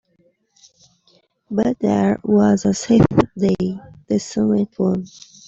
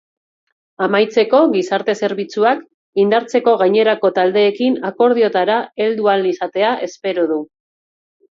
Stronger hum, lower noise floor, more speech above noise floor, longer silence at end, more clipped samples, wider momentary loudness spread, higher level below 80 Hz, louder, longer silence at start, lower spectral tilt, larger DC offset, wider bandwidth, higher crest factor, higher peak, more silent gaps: neither; second, -61 dBFS vs under -90 dBFS; second, 44 dB vs over 75 dB; second, 0.4 s vs 0.85 s; neither; first, 11 LU vs 7 LU; first, -46 dBFS vs -70 dBFS; about the same, -18 LUFS vs -16 LUFS; first, 1.5 s vs 0.8 s; first, -7 dB/octave vs -5.5 dB/octave; neither; about the same, 7.8 kHz vs 7.6 kHz; about the same, 16 dB vs 14 dB; about the same, -4 dBFS vs -2 dBFS; second, none vs 2.74-2.93 s